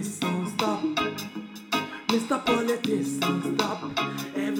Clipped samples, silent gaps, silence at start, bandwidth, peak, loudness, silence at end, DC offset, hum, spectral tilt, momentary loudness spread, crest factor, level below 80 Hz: under 0.1%; none; 0 s; 19 kHz; -6 dBFS; -27 LUFS; 0 s; under 0.1%; none; -4.5 dB/octave; 5 LU; 20 dB; -64 dBFS